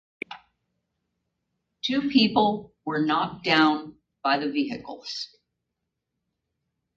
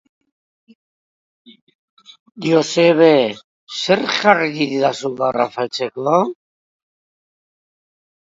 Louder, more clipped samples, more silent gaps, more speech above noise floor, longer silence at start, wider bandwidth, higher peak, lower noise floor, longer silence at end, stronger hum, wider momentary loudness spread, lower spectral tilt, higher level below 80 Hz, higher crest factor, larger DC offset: second, -25 LUFS vs -16 LUFS; neither; second, none vs 3.44-3.67 s; second, 58 dB vs over 74 dB; second, 0.3 s vs 2.35 s; about the same, 7.6 kHz vs 7.8 kHz; second, -6 dBFS vs 0 dBFS; second, -82 dBFS vs under -90 dBFS; second, 1.7 s vs 1.95 s; neither; first, 18 LU vs 12 LU; about the same, -5 dB/octave vs -4.5 dB/octave; about the same, -66 dBFS vs -68 dBFS; about the same, 22 dB vs 20 dB; neither